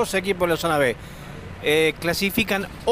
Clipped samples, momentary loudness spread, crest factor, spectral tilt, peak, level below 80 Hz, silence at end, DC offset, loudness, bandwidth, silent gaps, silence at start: under 0.1%; 16 LU; 16 dB; -4 dB/octave; -6 dBFS; -44 dBFS; 0 s; under 0.1%; -22 LUFS; 16 kHz; none; 0 s